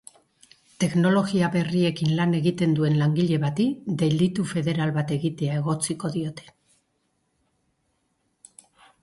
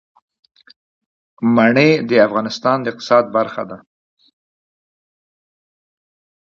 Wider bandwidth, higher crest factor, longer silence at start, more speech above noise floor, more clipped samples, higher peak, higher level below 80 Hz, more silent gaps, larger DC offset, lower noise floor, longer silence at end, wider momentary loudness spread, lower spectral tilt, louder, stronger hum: first, 11.5 kHz vs 7.2 kHz; about the same, 14 dB vs 18 dB; second, 0.8 s vs 1.4 s; second, 49 dB vs over 75 dB; neither; second, -10 dBFS vs 0 dBFS; about the same, -62 dBFS vs -64 dBFS; neither; neither; second, -72 dBFS vs under -90 dBFS; about the same, 2.6 s vs 2.7 s; second, 6 LU vs 13 LU; about the same, -6.5 dB/octave vs -6.5 dB/octave; second, -24 LUFS vs -15 LUFS; neither